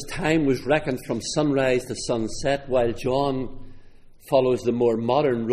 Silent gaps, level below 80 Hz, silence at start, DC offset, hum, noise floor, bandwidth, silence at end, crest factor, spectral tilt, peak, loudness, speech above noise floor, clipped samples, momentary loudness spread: none; -42 dBFS; 0 s; under 0.1%; none; -45 dBFS; 15 kHz; 0 s; 18 dB; -5.5 dB/octave; -6 dBFS; -23 LUFS; 22 dB; under 0.1%; 6 LU